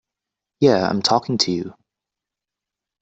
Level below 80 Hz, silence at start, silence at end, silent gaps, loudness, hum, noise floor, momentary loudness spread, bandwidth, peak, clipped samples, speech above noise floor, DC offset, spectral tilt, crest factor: -60 dBFS; 0.6 s; 1.3 s; none; -19 LUFS; none; -86 dBFS; 9 LU; 8.2 kHz; -2 dBFS; under 0.1%; 68 dB; under 0.1%; -4.5 dB/octave; 20 dB